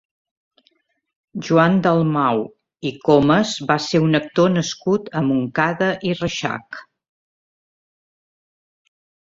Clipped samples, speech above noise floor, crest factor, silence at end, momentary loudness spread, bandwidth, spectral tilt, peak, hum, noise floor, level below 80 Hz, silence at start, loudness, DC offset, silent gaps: under 0.1%; 46 dB; 18 dB; 2.4 s; 14 LU; 7.8 kHz; -6 dB/octave; -2 dBFS; none; -64 dBFS; -56 dBFS; 1.35 s; -19 LUFS; under 0.1%; none